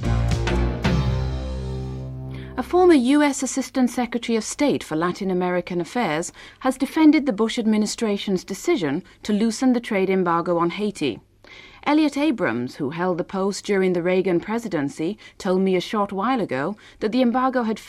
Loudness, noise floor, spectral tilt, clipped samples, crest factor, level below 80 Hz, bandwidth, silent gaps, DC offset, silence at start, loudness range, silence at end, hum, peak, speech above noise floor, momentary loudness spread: -22 LUFS; -46 dBFS; -5.5 dB/octave; under 0.1%; 16 dB; -36 dBFS; 14 kHz; none; under 0.1%; 0 s; 3 LU; 0 s; none; -6 dBFS; 25 dB; 11 LU